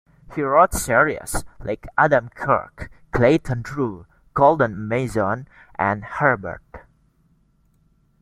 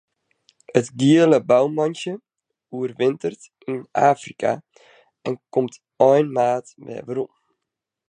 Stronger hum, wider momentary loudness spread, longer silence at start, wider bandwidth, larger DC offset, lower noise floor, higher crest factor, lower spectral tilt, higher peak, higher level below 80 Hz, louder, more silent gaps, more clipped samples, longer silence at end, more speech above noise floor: neither; about the same, 15 LU vs 17 LU; second, 0.3 s vs 0.75 s; first, 16.5 kHz vs 10 kHz; neither; second, -61 dBFS vs -83 dBFS; about the same, 20 dB vs 20 dB; about the same, -6 dB/octave vs -6.5 dB/octave; about the same, -2 dBFS vs -2 dBFS; first, -42 dBFS vs -72 dBFS; about the same, -20 LUFS vs -21 LUFS; neither; neither; first, 1.4 s vs 0.8 s; second, 40 dB vs 63 dB